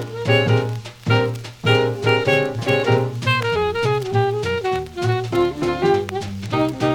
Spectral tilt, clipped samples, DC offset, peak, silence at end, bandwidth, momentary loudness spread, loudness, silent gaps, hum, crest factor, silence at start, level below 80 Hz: -6 dB/octave; under 0.1%; under 0.1%; -4 dBFS; 0 s; 15.5 kHz; 7 LU; -20 LUFS; none; none; 16 dB; 0 s; -48 dBFS